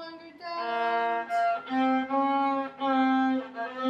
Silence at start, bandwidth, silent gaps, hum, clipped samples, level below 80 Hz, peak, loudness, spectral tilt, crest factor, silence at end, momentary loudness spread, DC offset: 0 s; 7.8 kHz; none; none; under 0.1%; -76 dBFS; -14 dBFS; -27 LUFS; -5 dB/octave; 14 dB; 0 s; 11 LU; under 0.1%